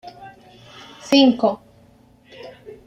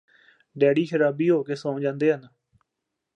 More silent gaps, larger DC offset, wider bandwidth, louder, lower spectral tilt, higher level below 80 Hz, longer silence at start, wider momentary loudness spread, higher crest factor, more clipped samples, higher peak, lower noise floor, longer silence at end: neither; neither; about the same, 9 kHz vs 9 kHz; first, -17 LUFS vs -23 LUFS; second, -4.5 dB/octave vs -7.5 dB/octave; first, -62 dBFS vs -78 dBFS; second, 0.05 s vs 0.55 s; first, 27 LU vs 7 LU; about the same, 18 dB vs 18 dB; neither; about the same, -4 dBFS vs -6 dBFS; second, -52 dBFS vs -83 dBFS; second, 0.35 s vs 0.9 s